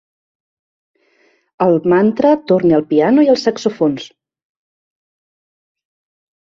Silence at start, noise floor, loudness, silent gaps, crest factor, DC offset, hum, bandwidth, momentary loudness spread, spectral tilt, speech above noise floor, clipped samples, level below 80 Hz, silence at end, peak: 1.6 s; -57 dBFS; -14 LUFS; none; 16 dB; under 0.1%; none; 7.6 kHz; 7 LU; -7 dB/octave; 44 dB; under 0.1%; -58 dBFS; 2.4 s; -2 dBFS